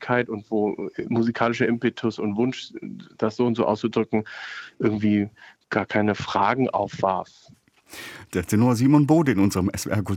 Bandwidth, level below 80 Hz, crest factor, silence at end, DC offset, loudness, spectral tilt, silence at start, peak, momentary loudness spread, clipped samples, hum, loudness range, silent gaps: 17 kHz; -60 dBFS; 18 dB; 0 s; under 0.1%; -23 LUFS; -6.5 dB/octave; 0 s; -4 dBFS; 16 LU; under 0.1%; none; 3 LU; none